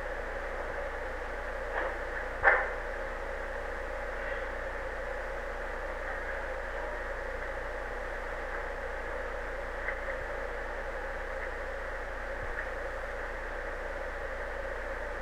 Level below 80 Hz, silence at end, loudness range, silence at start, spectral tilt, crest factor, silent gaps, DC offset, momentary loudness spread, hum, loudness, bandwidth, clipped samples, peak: -42 dBFS; 0 s; 5 LU; 0 s; -5 dB/octave; 26 dB; none; 0.2%; 3 LU; 60 Hz at -50 dBFS; -36 LUFS; 13 kHz; under 0.1%; -10 dBFS